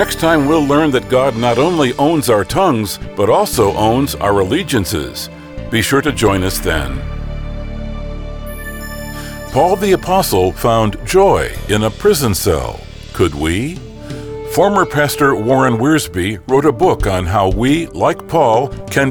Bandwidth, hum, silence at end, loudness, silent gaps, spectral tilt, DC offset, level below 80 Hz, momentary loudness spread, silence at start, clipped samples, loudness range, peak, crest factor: over 20 kHz; none; 0 s; -14 LUFS; none; -5 dB/octave; under 0.1%; -30 dBFS; 14 LU; 0 s; under 0.1%; 5 LU; -2 dBFS; 12 dB